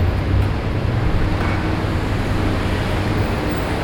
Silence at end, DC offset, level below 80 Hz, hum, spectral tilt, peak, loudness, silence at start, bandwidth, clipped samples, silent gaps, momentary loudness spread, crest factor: 0 s; under 0.1%; -24 dBFS; none; -7 dB/octave; -6 dBFS; -20 LUFS; 0 s; 18.5 kHz; under 0.1%; none; 2 LU; 12 dB